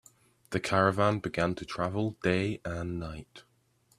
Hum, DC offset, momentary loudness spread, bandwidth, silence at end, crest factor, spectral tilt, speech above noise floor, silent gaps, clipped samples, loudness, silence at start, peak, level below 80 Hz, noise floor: none; under 0.1%; 11 LU; 13.5 kHz; 0.6 s; 22 dB; -6 dB/octave; 39 dB; none; under 0.1%; -30 LUFS; 0.5 s; -10 dBFS; -56 dBFS; -69 dBFS